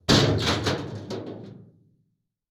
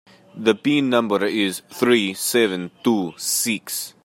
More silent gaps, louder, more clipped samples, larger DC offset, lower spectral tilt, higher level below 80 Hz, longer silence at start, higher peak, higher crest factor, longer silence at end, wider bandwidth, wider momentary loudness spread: neither; second, -25 LUFS vs -20 LUFS; neither; neither; about the same, -4.5 dB/octave vs -3.5 dB/octave; first, -44 dBFS vs -70 dBFS; second, 0.1 s vs 0.35 s; about the same, -6 dBFS vs -4 dBFS; about the same, 20 dB vs 18 dB; first, 0.9 s vs 0.15 s; first, over 20 kHz vs 16.5 kHz; first, 21 LU vs 5 LU